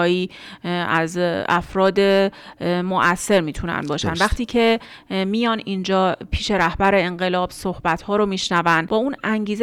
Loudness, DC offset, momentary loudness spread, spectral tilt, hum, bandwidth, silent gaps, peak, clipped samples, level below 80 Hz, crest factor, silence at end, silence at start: -20 LUFS; under 0.1%; 7 LU; -5 dB/octave; none; 15 kHz; none; -4 dBFS; under 0.1%; -40 dBFS; 16 dB; 0 s; 0 s